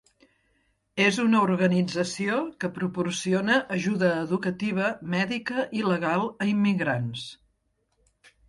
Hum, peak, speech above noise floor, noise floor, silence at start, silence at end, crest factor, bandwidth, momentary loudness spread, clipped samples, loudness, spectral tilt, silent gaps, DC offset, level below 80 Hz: none; -6 dBFS; 48 dB; -73 dBFS; 0.95 s; 1.15 s; 20 dB; 11.5 kHz; 8 LU; under 0.1%; -26 LUFS; -5.5 dB/octave; none; under 0.1%; -66 dBFS